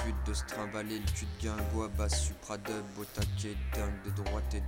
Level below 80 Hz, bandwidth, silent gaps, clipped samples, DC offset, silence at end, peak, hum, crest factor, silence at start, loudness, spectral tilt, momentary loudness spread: -38 dBFS; 16.5 kHz; none; under 0.1%; under 0.1%; 0 s; -18 dBFS; none; 16 dB; 0 s; -36 LUFS; -5 dB/octave; 6 LU